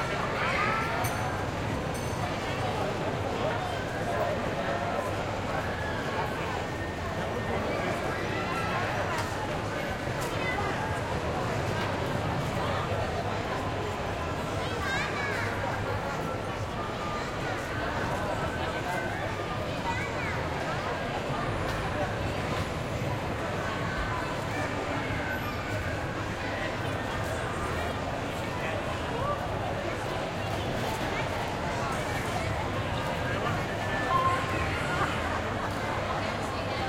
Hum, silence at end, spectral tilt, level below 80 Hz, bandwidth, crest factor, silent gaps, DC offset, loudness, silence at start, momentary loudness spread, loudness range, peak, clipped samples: none; 0 s; -5 dB/octave; -46 dBFS; 16.5 kHz; 16 dB; none; under 0.1%; -31 LUFS; 0 s; 3 LU; 2 LU; -14 dBFS; under 0.1%